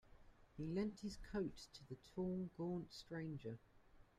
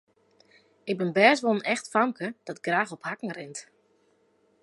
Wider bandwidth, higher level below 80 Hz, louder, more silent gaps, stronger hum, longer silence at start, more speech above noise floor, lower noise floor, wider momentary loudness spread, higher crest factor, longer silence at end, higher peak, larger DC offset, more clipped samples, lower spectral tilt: first, 13 kHz vs 11.5 kHz; first, -66 dBFS vs -82 dBFS; second, -48 LUFS vs -26 LUFS; neither; neither; second, 0.05 s vs 0.85 s; second, 21 dB vs 40 dB; about the same, -68 dBFS vs -66 dBFS; second, 12 LU vs 18 LU; second, 18 dB vs 24 dB; second, 0.15 s vs 1 s; second, -30 dBFS vs -4 dBFS; neither; neither; first, -7 dB/octave vs -4.5 dB/octave